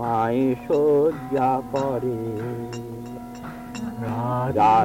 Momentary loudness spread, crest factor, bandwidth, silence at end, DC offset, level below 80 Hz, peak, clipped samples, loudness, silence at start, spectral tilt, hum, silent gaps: 16 LU; 12 dB; 16 kHz; 0 s; under 0.1%; -52 dBFS; -10 dBFS; under 0.1%; -23 LUFS; 0 s; -7.5 dB/octave; none; none